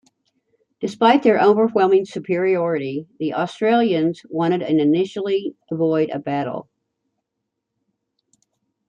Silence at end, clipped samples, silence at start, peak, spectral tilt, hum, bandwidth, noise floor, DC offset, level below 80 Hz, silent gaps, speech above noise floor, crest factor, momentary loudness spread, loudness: 2.25 s; under 0.1%; 0.8 s; -2 dBFS; -7 dB/octave; none; 9.2 kHz; -79 dBFS; under 0.1%; -68 dBFS; none; 61 dB; 18 dB; 11 LU; -19 LUFS